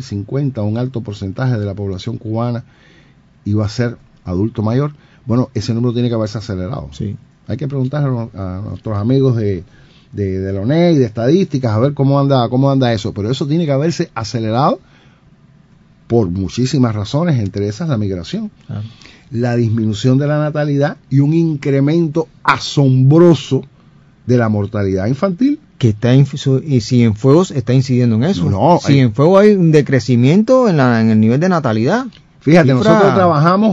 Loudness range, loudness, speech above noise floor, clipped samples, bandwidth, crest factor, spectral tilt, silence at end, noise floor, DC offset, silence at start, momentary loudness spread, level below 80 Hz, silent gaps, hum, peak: 8 LU; -14 LUFS; 33 dB; 0.1%; 7.8 kHz; 14 dB; -7.5 dB/octave; 0 s; -47 dBFS; under 0.1%; 0 s; 13 LU; -48 dBFS; none; none; 0 dBFS